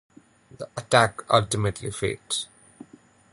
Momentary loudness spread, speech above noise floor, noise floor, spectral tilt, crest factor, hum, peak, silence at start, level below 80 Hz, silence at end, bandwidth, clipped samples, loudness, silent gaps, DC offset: 17 LU; 30 dB; -54 dBFS; -4 dB/octave; 24 dB; none; -2 dBFS; 0.6 s; -52 dBFS; 0.85 s; 11.5 kHz; under 0.1%; -24 LUFS; none; under 0.1%